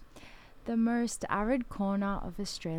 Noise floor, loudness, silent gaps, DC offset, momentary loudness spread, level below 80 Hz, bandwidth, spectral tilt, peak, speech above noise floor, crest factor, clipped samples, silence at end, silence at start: -52 dBFS; -32 LUFS; none; under 0.1%; 8 LU; -48 dBFS; 16 kHz; -5.5 dB/octave; -16 dBFS; 20 dB; 16 dB; under 0.1%; 0 s; 0 s